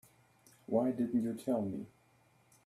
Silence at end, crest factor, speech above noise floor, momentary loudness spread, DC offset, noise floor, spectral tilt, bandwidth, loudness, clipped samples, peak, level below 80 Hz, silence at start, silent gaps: 0.8 s; 20 dB; 35 dB; 17 LU; under 0.1%; -69 dBFS; -8 dB/octave; 14 kHz; -35 LUFS; under 0.1%; -18 dBFS; -76 dBFS; 0.7 s; none